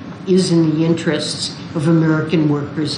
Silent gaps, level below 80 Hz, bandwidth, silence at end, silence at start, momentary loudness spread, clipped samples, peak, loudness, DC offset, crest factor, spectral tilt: none; -56 dBFS; 10.5 kHz; 0 s; 0 s; 7 LU; under 0.1%; -4 dBFS; -16 LUFS; under 0.1%; 12 dB; -6 dB/octave